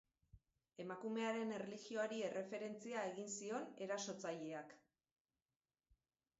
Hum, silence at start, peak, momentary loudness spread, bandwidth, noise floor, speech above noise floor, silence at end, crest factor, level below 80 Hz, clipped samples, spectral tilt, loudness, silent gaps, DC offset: none; 0.35 s; -32 dBFS; 9 LU; 7.6 kHz; under -90 dBFS; over 44 dB; 1.6 s; 16 dB; -84 dBFS; under 0.1%; -3.5 dB/octave; -47 LUFS; none; under 0.1%